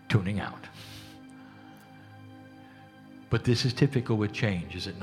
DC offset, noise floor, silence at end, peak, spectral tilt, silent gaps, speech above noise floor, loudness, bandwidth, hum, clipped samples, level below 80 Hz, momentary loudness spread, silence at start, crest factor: under 0.1%; -51 dBFS; 0 s; -10 dBFS; -6.5 dB/octave; none; 23 dB; -29 LUFS; 13.5 kHz; none; under 0.1%; -56 dBFS; 25 LU; 0.05 s; 22 dB